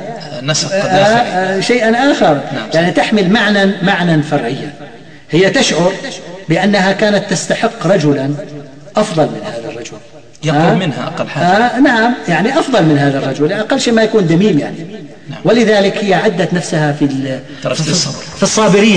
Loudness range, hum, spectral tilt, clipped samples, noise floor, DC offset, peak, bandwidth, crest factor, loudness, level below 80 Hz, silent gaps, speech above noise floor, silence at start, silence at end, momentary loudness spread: 4 LU; none; -5 dB/octave; under 0.1%; -35 dBFS; 1%; 0 dBFS; 10.5 kHz; 12 dB; -12 LUFS; -48 dBFS; none; 23 dB; 0 s; 0 s; 13 LU